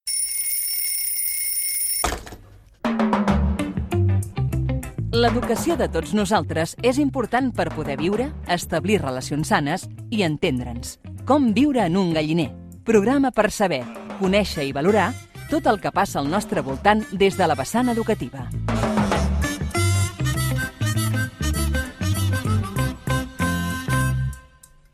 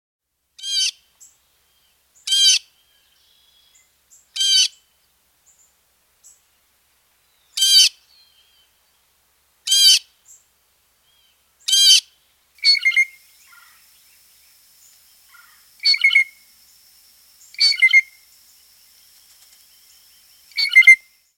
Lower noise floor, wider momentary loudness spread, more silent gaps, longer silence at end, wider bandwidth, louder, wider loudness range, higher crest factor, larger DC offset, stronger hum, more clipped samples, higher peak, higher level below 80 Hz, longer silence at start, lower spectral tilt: second, -50 dBFS vs -62 dBFS; second, 7 LU vs 18 LU; neither; first, 0.55 s vs 0.4 s; about the same, 16.5 kHz vs 17 kHz; second, -22 LUFS vs -13 LUFS; second, 3 LU vs 6 LU; about the same, 20 dB vs 20 dB; neither; neither; neither; about the same, -2 dBFS vs 0 dBFS; first, -34 dBFS vs -76 dBFS; second, 0.05 s vs 0.6 s; first, -5 dB/octave vs 8 dB/octave